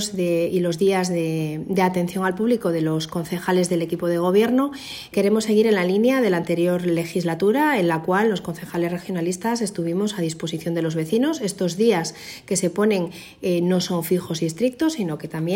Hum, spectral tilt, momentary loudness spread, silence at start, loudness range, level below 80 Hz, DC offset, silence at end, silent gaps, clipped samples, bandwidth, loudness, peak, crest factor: none; -5.5 dB/octave; 8 LU; 0 s; 3 LU; -60 dBFS; under 0.1%; 0 s; none; under 0.1%; 16.5 kHz; -22 LUFS; -6 dBFS; 14 dB